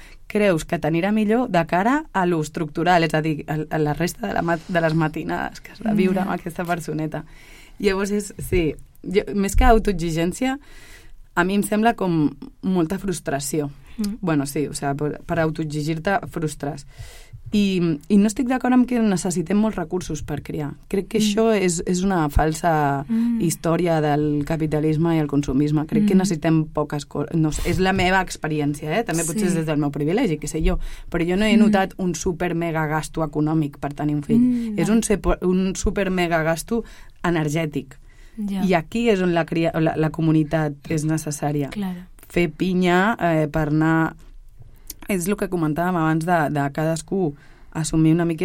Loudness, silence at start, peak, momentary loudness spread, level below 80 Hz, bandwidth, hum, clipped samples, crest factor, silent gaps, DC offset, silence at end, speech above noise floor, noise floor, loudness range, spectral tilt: -22 LUFS; 0 s; -2 dBFS; 9 LU; -34 dBFS; 16.5 kHz; none; under 0.1%; 20 dB; none; under 0.1%; 0 s; 21 dB; -42 dBFS; 3 LU; -6 dB/octave